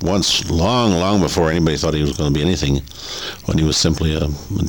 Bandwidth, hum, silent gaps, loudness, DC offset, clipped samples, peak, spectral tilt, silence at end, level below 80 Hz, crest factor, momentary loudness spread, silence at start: 20 kHz; none; none; -17 LUFS; 0.5%; under 0.1%; -4 dBFS; -5 dB/octave; 0 s; -30 dBFS; 14 dB; 7 LU; 0 s